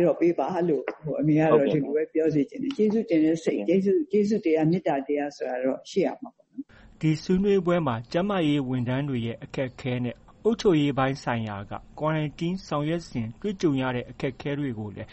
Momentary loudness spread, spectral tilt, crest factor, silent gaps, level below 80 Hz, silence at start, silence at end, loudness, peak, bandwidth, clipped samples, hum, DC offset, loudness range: 10 LU; -7.5 dB/octave; 18 dB; none; -54 dBFS; 0 s; 0 s; -26 LUFS; -6 dBFS; 8.4 kHz; under 0.1%; none; under 0.1%; 4 LU